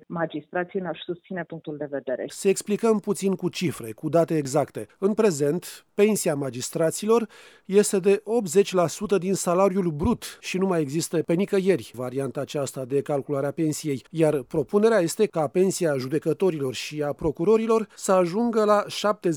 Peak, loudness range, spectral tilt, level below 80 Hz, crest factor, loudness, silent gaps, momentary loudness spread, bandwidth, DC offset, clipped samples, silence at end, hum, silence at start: -6 dBFS; 3 LU; -5.5 dB/octave; -54 dBFS; 18 dB; -24 LUFS; none; 9 LU; over 20 kHz; under 0.1%; under 0.1%; 0 s; none; 0.1 s